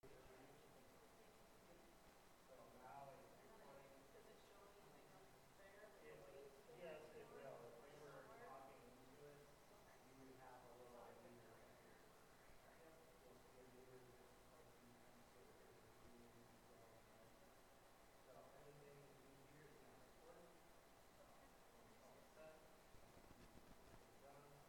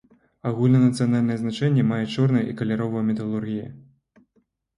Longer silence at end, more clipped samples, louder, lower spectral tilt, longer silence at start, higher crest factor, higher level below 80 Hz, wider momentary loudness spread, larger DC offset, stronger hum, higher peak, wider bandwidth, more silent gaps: second, 0 s vs 0.95 s; neither; second, -66 LUFS vs -23 LUFS; second, -4.5 dB/octave vs -8 dB/octave; second, 0.05 s vs 0.45 s; about the same, 18 dB vs 14 dB; second, -80 dBFS vs -60 dBFS; second, 7 LU vs 12 LU; neither; neither; second, -46 dBFS vs -8 dBFS; first, 18 kHz vs 11 kHz; neither